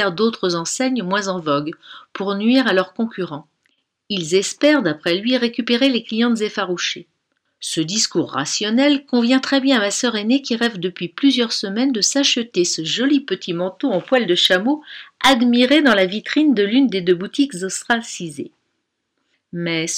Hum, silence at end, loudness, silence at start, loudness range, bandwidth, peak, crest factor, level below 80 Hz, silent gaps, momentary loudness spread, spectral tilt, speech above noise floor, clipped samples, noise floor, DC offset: none; 0 s; -18 LUFS; 0 s; 4 LU; 15.5 kHz; -4 dBFS; 14 dB; -62 dBFS; none; 11 LU; -3.5 dB/octave; 55 dB; under 0.1%; -73 dBFS; under 0.1%